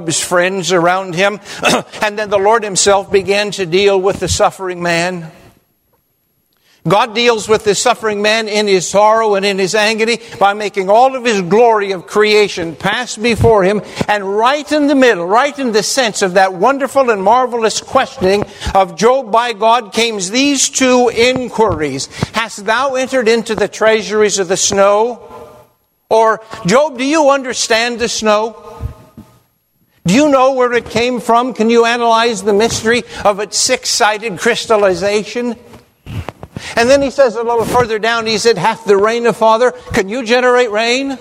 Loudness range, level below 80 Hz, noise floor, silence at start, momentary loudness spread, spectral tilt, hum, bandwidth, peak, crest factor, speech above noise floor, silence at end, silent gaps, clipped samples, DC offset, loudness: 3 LU; -40 dBFS; -61 dBFS; 0 s; 6 LU; -3.5 dB/octave; none; 16 kHz; 0 dBFS; 12 dB; 49 dB; 0 s; none; 0.1%; under 0.1%; -12 LUFS